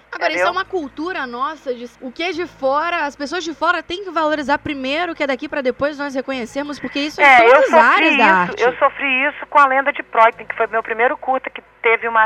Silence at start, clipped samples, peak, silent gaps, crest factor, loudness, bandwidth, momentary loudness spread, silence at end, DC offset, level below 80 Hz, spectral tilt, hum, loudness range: 0.1 s; under 0.1%; 0 dBFS; none; 16 dB; -16 LUFS; 12.5 kHz; 14 LU; 0 s; under 0.1%; -54 dBFS; -4 dB/octave; none; 9 LU